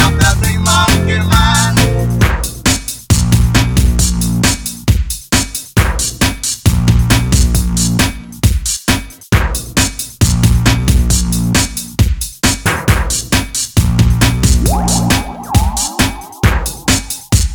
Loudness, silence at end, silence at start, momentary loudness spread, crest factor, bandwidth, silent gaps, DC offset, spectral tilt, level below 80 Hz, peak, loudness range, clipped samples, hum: -13 LUFS; 0 s; 0 s; 5 LU; 12 dB; over 20 kHz; none; under 0.1%; -4 dB/octave; -18 dBFS; 0 dBFS; 2 LU; under 0.1%; none